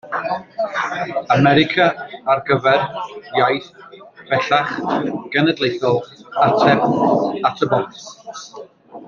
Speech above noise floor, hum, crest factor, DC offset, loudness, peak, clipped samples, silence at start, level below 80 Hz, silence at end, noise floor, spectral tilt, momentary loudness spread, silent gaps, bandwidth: 22 dB; none; 18 dB; under 0.1%; -18 LUFS; -2 dBFS; under 0.1%; 0.05 s; -58 dBFS; 0 s; -40 dBFS; -6 dB/octave; 14 LU; none; 7.2 kHz